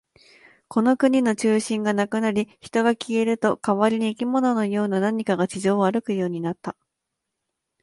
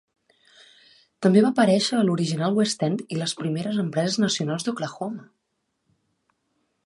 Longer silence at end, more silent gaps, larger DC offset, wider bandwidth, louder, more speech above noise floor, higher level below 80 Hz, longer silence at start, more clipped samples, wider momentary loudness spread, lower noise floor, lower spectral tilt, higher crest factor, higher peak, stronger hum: second, 1.1 s vs 1.6 s; neither; neither; about the same, 11.5 kHz vs 11.5 kHz; about the same, -22 LUFS vs -23 LUFS; first, 60 dB vs 54 dB; about the same, -66 dBFS vs -70 dBFS; second, 0.7 s vs 1.2 s; neither; second, 7 LU vs 11 LU; first, -81 dBFS vs -76 dBFS; about the same, -6 dB/octave vs -5.5 dB/octave; about the same, 18 dB vs 20 dB; about the same, -6 dBFS vs -6 dBFS; neither